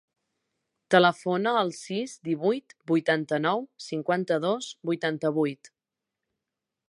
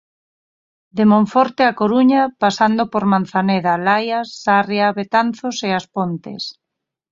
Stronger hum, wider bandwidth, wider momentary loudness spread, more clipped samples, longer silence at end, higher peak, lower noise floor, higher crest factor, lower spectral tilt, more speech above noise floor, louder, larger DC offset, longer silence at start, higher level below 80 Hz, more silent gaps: neither; first, 11.5 kHz vs 7.6 kHz; about the same, 10 LU vs 9 LU; neither; first, 1.25 s vs 0.6 s; about the same, -4 dBFS vs -2 dBFS; first, -88 dBFS vs -81 dBFS; first, 24 dB vs 16 dB; about the same, -5.5 dB/octave vs -6 dB/octave; about the same, 62 dB vs 65 dB; second, -27 LUFS vs -17 LUFS; neither; about the same, 0.9 s vs 0.95 s; second, -80 dBFS vs -60 dBFS; neither